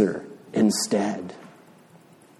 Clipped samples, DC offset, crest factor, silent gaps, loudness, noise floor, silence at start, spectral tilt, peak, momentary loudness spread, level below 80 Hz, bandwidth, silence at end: under 0.1%; under 0.1%; 18 dB; none; -25 LUFS; -52 dBFS; 0 s; -4.5 dB/octave; -8 dBFS; 17 LU; -70 dBFS; 13.5 kHz; 0.9 s